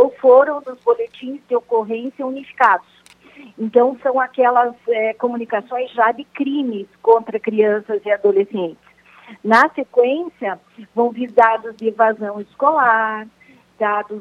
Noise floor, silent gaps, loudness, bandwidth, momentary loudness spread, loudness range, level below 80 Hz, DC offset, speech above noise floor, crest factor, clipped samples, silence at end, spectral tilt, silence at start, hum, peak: -45 dBFS; none; -18 LUFS; 7.4 kHz; 13 LU; 2 LU; -68 dBFS; under 0.1%; 28 dB; 18 dB; under 0.1%; 0 s; -6 dB/octave; 0 s; none; 0 dBFS